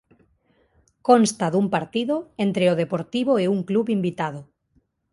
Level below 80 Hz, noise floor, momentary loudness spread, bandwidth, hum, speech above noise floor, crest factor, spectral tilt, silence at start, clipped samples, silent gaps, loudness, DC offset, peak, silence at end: -64 dBFS; -66 dBFS; 10 LU; 11.5 kHz; none; 45 dB; 22 dB; -6 dB/octave; 1.05 s; under 0.1%; none; -22 LUFS; under 0.1%; -2 dBFS; 0.7 s